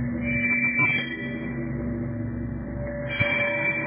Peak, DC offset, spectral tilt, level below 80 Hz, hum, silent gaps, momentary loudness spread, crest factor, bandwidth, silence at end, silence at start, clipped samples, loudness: -10 dBFS; under 0.1%; -4.5 dB/octave; -42 dBFS; none; none; 11 LU; 18 dB; 4 kHz; 0 s; 0 s; under 0.1%; -25 LUFS